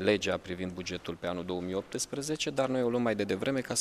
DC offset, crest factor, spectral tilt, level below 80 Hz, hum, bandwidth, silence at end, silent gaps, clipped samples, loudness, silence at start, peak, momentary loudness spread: under 0.1%; 22 dB; -4 dB/octave; -62 dBFS; none; 15 kHz; 0 s; none; under 0.1%; -32 LUFS; 0 s; -10 dBFS; 7 LU